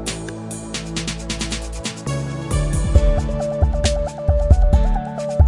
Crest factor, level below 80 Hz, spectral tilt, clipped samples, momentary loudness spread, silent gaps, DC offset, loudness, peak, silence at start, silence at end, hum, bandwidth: 18 dB; -20 dBFS; -5.5 dB/octave; under 0.1%; 11 LU; none; under 0.1%; -21 LUFS; 0 dBFS; 0 s; 0 s; none; 11.5 kHz